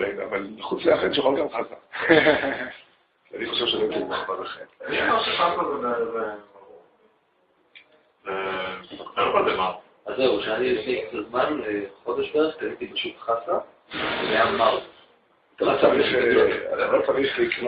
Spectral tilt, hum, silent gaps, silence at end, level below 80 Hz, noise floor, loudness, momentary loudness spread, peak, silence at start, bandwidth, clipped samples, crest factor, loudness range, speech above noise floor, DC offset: -8.5 dB/octave; none; none; 0 s; -58 dBFS; -65 dBFS; -24 LUFS; 13 LU; -2 dBFS; 0 s; 5.2 kHz; under 0.1%; 22 dB; 6 LU; 41 dB; under 0.1%